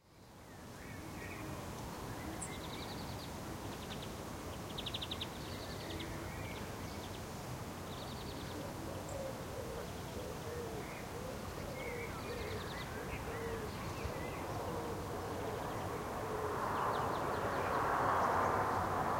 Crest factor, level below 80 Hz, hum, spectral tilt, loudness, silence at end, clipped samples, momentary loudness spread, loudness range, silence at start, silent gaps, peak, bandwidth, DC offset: 22 dB; -56 dBFS; none; -4.5 dB/octave; -41 LUFS; 0 s; under 0.1%; 10 LU; 8 LU; 0.05 s; none; -20 dBFS; 16.5 kHz; under 0.1%